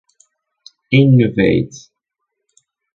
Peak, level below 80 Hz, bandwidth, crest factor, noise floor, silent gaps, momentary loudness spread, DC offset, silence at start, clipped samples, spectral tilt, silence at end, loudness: 0 dBFS; -46 dBFS; 7.4 kHz; 16 dB; -77 dBFS; none; 8 LU; under 0.1%; 0.9 s; under 0.1%; -7.5 dB/octave; 1.15 s; -13 LUFS